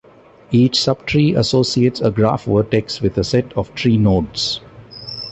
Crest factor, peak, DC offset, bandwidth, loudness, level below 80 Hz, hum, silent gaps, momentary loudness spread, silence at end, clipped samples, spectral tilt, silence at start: 14 dB; -2 dBFS; under 0.1%; 8.4 kHz; -17 LUFS; -40 dBFS; none; none; 10 LU; 0 s; under 0.1%; -6 dB/octave; 0.5 s